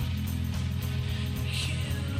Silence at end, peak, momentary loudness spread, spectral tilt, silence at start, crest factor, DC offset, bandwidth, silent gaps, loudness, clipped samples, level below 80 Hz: 0 s; -20 dBFS; 1 LU; -5 dB/octave; 0 s; 10 dB; under 0.1%; 16 kHz; none; -31 LUFS; under 0.1%; -40 dBFS